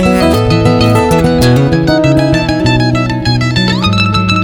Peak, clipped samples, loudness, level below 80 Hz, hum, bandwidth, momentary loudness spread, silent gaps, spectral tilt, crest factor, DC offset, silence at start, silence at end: 0 dBFS; under 0.1%; -10 LUFS; -26 dBFS; none; 17.5 kHz; 3 LU; none; -6 dB/octave; 10 dB; under 0.1%; 0 s; 0 s